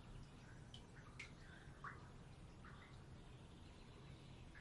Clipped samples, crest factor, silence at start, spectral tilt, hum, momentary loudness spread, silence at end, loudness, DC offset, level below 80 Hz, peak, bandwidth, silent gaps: under 0.1%; 20 dB; 0 s; -5 dB/octave; none; 5 LU; 0 s; -60 LUFS; under 0.1%; -66 dBFS; -38 dBFS; 11 kHz; none